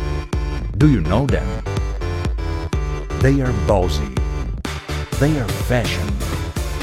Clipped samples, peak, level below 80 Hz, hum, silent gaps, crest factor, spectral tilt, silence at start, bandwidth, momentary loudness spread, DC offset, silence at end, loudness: under 0.1%; -2 dBFS; -24 dBFS; none; none; 18 dB; -6.5 dB/octave; 0 s; 16 kHz; 9 LU; under 0.1%; 0 s; -20 LUFS